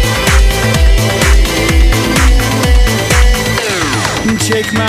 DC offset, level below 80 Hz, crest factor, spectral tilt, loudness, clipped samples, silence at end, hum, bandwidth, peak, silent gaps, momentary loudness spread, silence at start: under 0.1%; -12 dBFS; 10 dB; -4 dB/octave; -11 LUFS; under 0.1%; 0 s; none; 16 kHz; 0 dBFS; none; 3 LU; 0 s